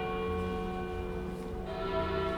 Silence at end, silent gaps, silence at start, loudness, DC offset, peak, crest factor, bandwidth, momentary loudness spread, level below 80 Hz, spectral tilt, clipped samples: 0 s; none; 0 s; -36 LUFS; under 0.1%; -20 dBFS; 14 dB; 20 kHz; 6 LU; -44 dBFS; -7 dB/octave; under 0.1%